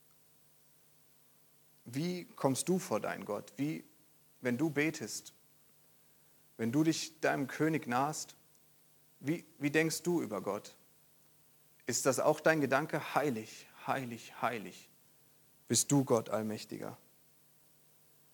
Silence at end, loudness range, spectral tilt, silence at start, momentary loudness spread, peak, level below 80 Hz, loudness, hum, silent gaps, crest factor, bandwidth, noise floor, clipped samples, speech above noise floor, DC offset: 1.4 s; 4 LU; -4.5 dB/octave; 1.85 s; 15 LU; -12 dBFS; -84 dBFS; -35 LUFS; none; none; 24 dB; 19 kHz; -66 dBFS; under 0.1%; 31 dB; under 0.1%